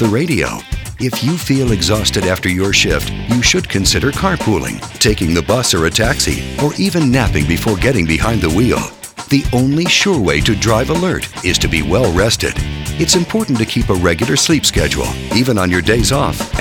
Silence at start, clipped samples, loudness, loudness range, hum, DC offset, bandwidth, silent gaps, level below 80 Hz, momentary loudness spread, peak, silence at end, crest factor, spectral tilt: 0 s; under 0.1%; -14 LUFS; 1 LU; none; under 0.1%; over 20 kHz; none; -26 dBFS; 6 LU; 0 dBFS; 0 s; 14 dB; -4 dB/octave